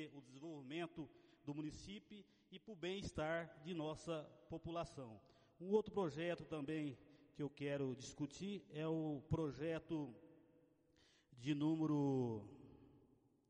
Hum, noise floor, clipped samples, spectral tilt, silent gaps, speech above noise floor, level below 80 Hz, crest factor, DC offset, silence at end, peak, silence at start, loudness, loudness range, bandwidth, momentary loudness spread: none; -75 dBFS; under 0.1%; -6.5 dB/octave; none; 30 dB; -70 dBFS; 22 dB; under 0.1%; 0.5 s; -26 dBFS; 0 s; -46 LUFS; 4 LU; 10 kHz; 18 LU